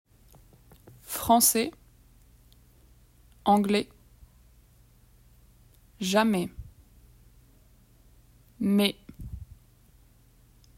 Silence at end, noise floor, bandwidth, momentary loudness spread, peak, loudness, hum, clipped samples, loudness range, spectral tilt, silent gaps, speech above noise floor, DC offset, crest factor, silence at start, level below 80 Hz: 1.35 s; -59 dBFS; 16 kHz; 23 LU; -6 dBFS; -25 LUFS; none; under 0.1%; 6 LU; -4 dB/octave; none; 35 dB; under 0.1%; 24 dB; 1.1 s; -54 dBFS